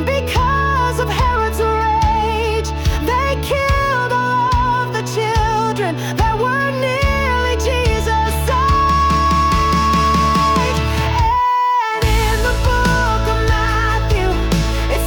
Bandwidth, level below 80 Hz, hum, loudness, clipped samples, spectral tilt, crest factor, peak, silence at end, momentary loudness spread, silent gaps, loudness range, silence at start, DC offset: 18 kHz; -22 dBFS; none; -16 LUFS; under 0.1%; -5 dB/octave; 10 dB; -6 dBFS; 0 s; 4 LU; none; 2 LU; 0 s; under 0.1%